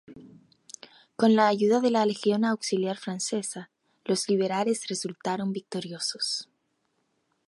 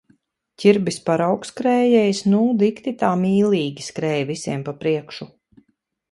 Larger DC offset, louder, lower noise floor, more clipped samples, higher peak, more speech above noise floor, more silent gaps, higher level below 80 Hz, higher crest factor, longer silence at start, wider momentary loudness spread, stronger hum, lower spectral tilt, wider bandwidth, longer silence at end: neither; second, -27 LUFS vs -20 LUFS; first, -74 dBFS vs -68 dBFS; neither; second, -10 dBFS vs -2 dBFS; about the same, 48 dB vs 49 dB; neither; second, -76 dBFS vs -64 dBFS; about the same, 18 dB vs 20 dB; second, 0.1 s vs 0.6 s; first, 19 LU vs 10 LU; neither; second, -4 dB/octave vs -6 dB/octave; about the same, 11.5 kHz vs 11.5 kHz; first, 1.05 s vs 0.85 s